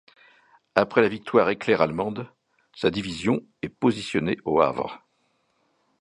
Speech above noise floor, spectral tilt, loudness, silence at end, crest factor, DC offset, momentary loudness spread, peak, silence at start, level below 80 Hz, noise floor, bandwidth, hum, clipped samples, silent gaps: 46 dB; -6 dB/octave; -24 LUFS; 1.05 s; 24 dB; under 0.1%; 12 LU; 0 dBFS; 0.75 s; -58 dBFS; -70 dBFS; 10.5 kHz; none; under 0.1%; none